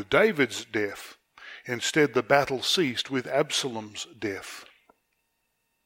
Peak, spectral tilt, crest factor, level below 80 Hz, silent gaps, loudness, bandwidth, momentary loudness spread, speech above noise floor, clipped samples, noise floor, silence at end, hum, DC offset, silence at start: -4 dBFS; -3.5 dB/octave; 24 dB; -64 dBFS; none; -26 LUFS; 17 kHz; 19 LU; 49 dB; under 0.1%; -76 dBFS; 1.2 s; none; under 0.1%; 0 s